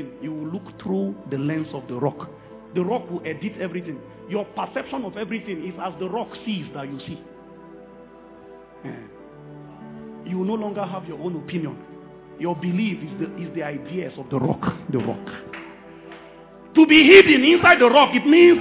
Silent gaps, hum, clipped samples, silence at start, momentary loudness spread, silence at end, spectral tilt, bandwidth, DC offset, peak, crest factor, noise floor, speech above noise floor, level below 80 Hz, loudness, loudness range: none; none; under 0.1%; 0 s; 25 LU; 0 s; -9 dB/octave; 4 kHz; under 0.1%; 0 dBFS; 20 dB; -45 dBFS; 25 dB; -58 dBFS; -19 LUFS; 19 LU